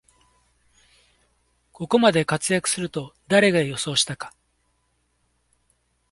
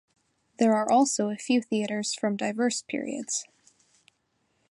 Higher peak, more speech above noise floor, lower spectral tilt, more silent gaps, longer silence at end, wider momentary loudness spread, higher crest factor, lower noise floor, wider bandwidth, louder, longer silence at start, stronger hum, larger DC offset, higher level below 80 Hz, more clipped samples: first, -2 dBFS vs -10 dBFS; about the same, 48 dB vs 47 dB; about the same, -3.5 dB/octave vs -3.5 dB/octave; neither; first, 1.8 s vs 1.25 s; first, 16 LU vs 9 LU; about the same, 22 dB vs 18 dB; second, -69 dBFS vs -73 dBFS; about the same, 11.5 kHz vs 11.5 kHz; first, -21 LUFS vs -27 LUFS; first, 1.8 s vs 0.6 s; neither; neither; first, -60 dBFS vs -80 dBFS; neither